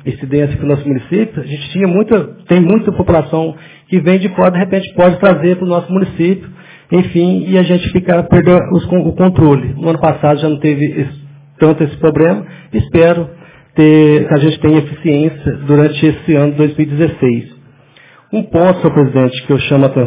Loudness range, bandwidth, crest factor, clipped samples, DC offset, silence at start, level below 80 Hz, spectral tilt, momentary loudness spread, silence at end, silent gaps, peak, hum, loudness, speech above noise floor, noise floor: 3 LU; 4 kHz; 12 dB; 0.4%; under 0.1%; 0.05 s; -36 dBFS; -12 dB/octave; 8 LU; 0 s; none; 0 dBFS; none; -12 LUFS; 33 dB; -43 dBFS